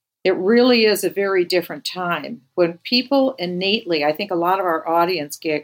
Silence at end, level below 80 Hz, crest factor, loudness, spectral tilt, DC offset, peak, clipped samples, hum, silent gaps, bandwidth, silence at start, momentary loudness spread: 0 s; -80 dBFS; 16 dB; -19 LUFS; -4.5 dB/octave; under 0.1%; -4 dBFS; under 0.1%; none; none; 17 kHz; 0.25 s; 9 LU